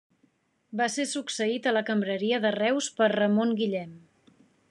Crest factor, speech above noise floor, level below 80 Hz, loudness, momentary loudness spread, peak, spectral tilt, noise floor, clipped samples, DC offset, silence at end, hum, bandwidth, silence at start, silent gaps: 18 dB; 42 dB; -84 dBFS; -27 LUFS; 6 LU; -10 dBFS; -4 dB/octave; -68 dBFS; under 0.1%; under 0.1%; 0.75 s; none; 11 kHz; 0.7 s; none